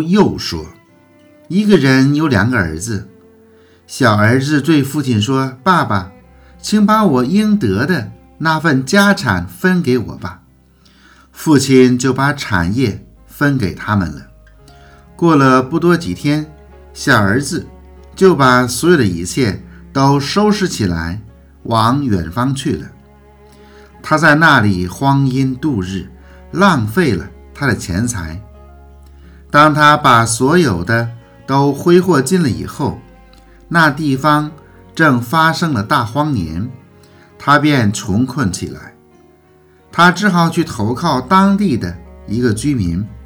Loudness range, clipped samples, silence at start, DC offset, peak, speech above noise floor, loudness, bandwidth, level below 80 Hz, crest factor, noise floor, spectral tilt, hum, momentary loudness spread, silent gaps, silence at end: 4 LU; 0.2%; 0 s; under 0.1%; 0 dBFS; 35 dB; -13 LUFS; over 20 kHz; -42 dBFS; 14 dB; -48 dBFS; -5.5 dB/octave; none; 14 LU; none; 0 s